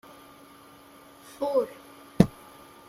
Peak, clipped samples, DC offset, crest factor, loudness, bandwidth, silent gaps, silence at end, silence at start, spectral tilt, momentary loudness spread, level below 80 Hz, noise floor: -2 dBFS; under 0.1%; under 0.1%; 28 dB; -27 LUFS; 15.5 kHz; none; 0.6 s; 1.4 s; -7.5 dB/octave; 25 LU; -54 dBFS; -52 dBFS